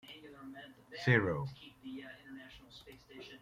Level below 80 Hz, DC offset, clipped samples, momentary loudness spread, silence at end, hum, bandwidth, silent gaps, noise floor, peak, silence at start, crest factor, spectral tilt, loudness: -68 dBFS; under 0.1%; under 0.1%; 24 LU; 0.05 s; none; 14.5 kHz; none; -57 dBFS; -14 dBFS; 0.05 s; 26 dB; -7 dB/octave; -34 LUFS